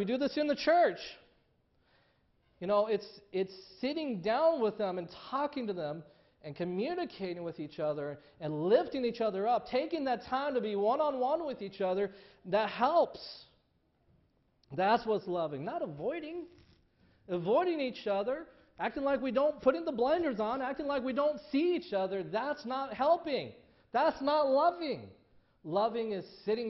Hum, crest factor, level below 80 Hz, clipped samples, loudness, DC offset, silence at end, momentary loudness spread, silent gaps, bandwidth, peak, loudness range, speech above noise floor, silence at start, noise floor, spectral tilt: none; 18 dB; -70 dBFS; under 0.1%; -33 LUFS; under 0.1%; 0 s; 12 LU; none; 6 kHz; -14 dBFS; 4 LU; 41 dB; 0 s; -73 dBFS; -4 dB/octave